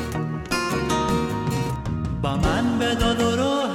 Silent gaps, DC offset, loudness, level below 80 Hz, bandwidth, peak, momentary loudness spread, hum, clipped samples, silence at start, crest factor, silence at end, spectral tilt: none; under 0.1%; -23 LUFS; -36 dBFS; 17 kHz; -8 dBFS; 6 LU; none; under 0.1%; 0 s; 14 dB; 0 s; -5.5 dB/octave